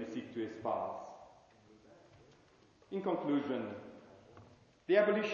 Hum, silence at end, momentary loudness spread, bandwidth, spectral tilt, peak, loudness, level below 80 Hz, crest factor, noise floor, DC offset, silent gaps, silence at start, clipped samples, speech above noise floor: none; 0 s; 26 LU; 7.2 kHz; -6.5 dB/octave; -18 dBFS; -36 LUFS; -78 dBFS; 20 dB; -65 dBFS; under 0.1%; none; 0 s; under 0.1%; 31 dB